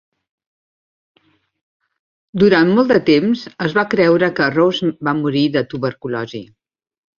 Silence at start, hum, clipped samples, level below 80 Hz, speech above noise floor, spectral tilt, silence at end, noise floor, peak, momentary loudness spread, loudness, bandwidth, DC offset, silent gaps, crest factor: 2.35 s; none; under 0.1%; -56 dBFS; over 75 dB; -7 dB/octave; 0.75 s; under -90 dBFS; -2 dBFS; 12 LU; -16 LUFS; 7 kHz; under 0.1%; none; 16 dB